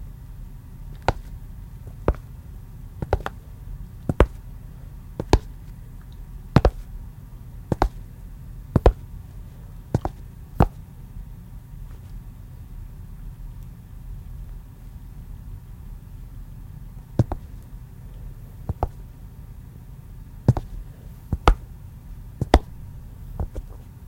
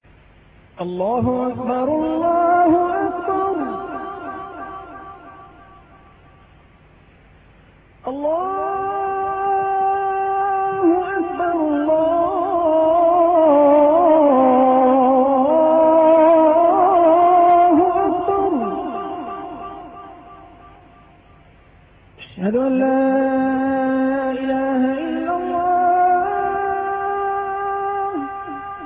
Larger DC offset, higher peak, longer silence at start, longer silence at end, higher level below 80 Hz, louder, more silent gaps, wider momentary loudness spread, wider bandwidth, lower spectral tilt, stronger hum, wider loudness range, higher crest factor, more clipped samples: neither; first, 0 dBFS vs -6 dBFS; second, 0 s vs 0.8 s; about the same, 0 s vs 0 s; first, -32 dBFS vs -52 dBFS; second, -26 LUFS vs -17 LUFS; neither; first, 20 LU vs 17 LU; first, 16.5 kHz vs 3.8 kHz; second, -7.5 dB/octave vs -11.5 dB/octave; neither; about the same, 15 LU vs 15 LU; first, 28 dB vs 12 dB; neither